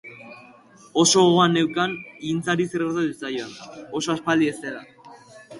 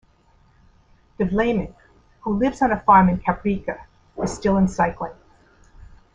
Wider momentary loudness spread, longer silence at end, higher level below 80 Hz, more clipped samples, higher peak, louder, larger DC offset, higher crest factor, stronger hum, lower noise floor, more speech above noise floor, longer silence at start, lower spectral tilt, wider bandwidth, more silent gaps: first, 21 LU vs 18 LU; second, 0 s vs 1 s; second, -64 dBFS vs -42 dBFS; neither; second, -6 dBFS vs -2 dBFS; about the same, -22 LUFS vs -20 LUFS; neither; about the same, 18 dB vs 20 dB; neither; second, -49 dBFS vs -57 dBFS; second, 28 dB vs 37 dB; second, 0.05 s vs 1.2 s; second, -4 dB/octave vs -7 dB/octave; first, 11.5 kHz vs 9.4 kHz; neither